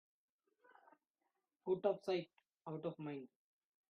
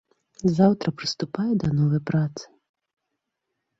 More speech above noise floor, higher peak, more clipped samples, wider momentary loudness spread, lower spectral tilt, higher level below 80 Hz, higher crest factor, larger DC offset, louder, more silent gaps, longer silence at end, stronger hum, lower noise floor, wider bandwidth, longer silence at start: second, 47 dB vs 58 dB; second, -24 dBFS vs -6 dBFS; neither; first, 19 LU vs 9 LU; second, -5.5 dB/octave vs -7 dB/octave; second, -88 dBFS vs -56 dBFS; about the same, 22 dB vs 18 dB; neither; second, -43 LUFS vs -24 LUFS; neither; second, 0.65 s vs 1.35 s; neither; first, -89 dBFS vs -81 dBFS; second, 6.6 kHz vs 7.8 kHz; first, 1.65 s vs 0.45 s